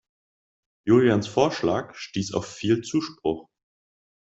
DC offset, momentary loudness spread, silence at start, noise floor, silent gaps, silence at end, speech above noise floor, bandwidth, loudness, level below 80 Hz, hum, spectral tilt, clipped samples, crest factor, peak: under 0.1%; 12 LU; 0.85 s; under -90 dBFS; none; 0.8 s; over 67 dB; 8 kHz; -24 LUFS; -58 dBFS; none; -6 dB/octave; under 0.1%; 20 dB; -6 dBFS